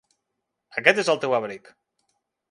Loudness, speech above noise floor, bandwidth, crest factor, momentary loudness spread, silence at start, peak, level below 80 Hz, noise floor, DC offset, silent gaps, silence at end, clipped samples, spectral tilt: -22 LUFS; 58 dB; 11.5 kHz; 26 dB; 16 LU; 0.75 s; 0 dBFS; -76 dBFS; -81 dBFS; under 0.1%; none; 0.95 s; under 0.1%; -3.5 dB/octave